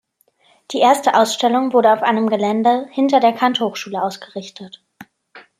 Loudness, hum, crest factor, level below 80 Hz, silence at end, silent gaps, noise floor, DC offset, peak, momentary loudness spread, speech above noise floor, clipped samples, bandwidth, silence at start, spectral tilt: -16 LUFS; none; 16 dB; -70 dBFS; 0.2 s; none; -58 dBFS; under 0.1%; -2 dBFS; 16 LU; 42 dB; under 0.1%; 15.5 kHz; 0.7 s; -4 dB/octave